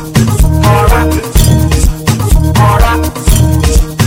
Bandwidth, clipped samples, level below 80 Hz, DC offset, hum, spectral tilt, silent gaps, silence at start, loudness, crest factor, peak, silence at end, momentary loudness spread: 17 kHz; 1%; -12 dBFS; under 0.1%; none; -5.5 dB/octave; none; 0 s; -9 LUFS; 8 dB; 0 dBFS; 0 s; 3 LU